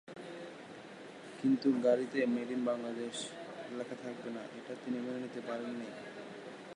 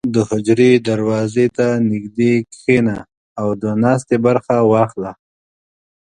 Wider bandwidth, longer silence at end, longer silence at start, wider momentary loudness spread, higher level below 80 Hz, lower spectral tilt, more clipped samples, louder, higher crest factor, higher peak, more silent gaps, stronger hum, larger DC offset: first, 11 kHz vs 9.8 kHz; second, 0 s vs 1 s; about the same, 0.05 s vs 0.05 s; first, 18 LU vs 9 LU; second, -86 dBFS vs -52 dBFS; second, -5 dB/octave vs -7 dB/octave; neither; second, -37 LUFS vs -16 LUFS; about the same, 20 dB vs 16 dB; second, -18 dBFS vs 0 dBFS; second, none vs 3.17-3.36 s; neither; neither